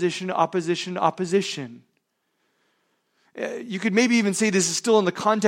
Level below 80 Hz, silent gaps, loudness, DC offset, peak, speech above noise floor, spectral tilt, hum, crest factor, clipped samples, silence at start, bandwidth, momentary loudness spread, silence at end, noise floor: -74 dBFS; none; -23 LUFS; under 0.1%; -6 dBFS; 51 dB; -4 dB/octave; none; 18 dB; under 0.1%; 0 s; 16.5 kHz; 12 LU; 0 s; -73 dBFS